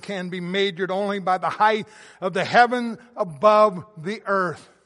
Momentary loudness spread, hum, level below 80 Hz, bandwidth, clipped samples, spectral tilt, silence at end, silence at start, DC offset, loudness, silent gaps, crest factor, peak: 13 LU; none; -72 dBFS; 11.5 kHz; under 0.1%; -5.5 dB/octave; 0.25 s; 0.05 s; under 0.1%; -22 LUFS; none; 20 dB; -2 dBFS